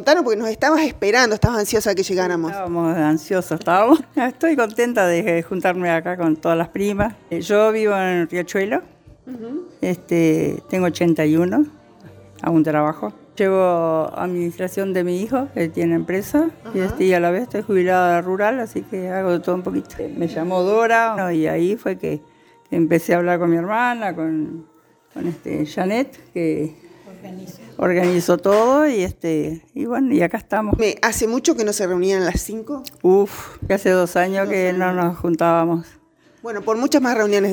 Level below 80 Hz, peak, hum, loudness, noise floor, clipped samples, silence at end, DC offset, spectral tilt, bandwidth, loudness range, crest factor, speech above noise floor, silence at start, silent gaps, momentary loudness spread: -44 dBFS; 0 dBFS; none; -19 LUFS; -44 dBFS; under 0.1%; 0 s; under 0.1%; -5.5 dB/octave; over 20 kHz; 3 LU; 18 dB; 25 dB; 0 s; none; 10 LU